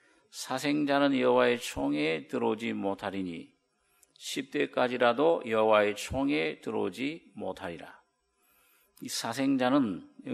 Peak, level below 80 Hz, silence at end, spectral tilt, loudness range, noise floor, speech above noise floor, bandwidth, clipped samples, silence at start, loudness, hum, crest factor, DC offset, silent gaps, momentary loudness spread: -10 dBFS; -60 dBFS; 0 s; -4.5 dB/octave; 6 LU; -72 dBFS; 43 dB; 14.5 kHz; under 0.1%; 0.35 s; -29 LUFS; none; 20 dB; under 0.1%; none; 15 LU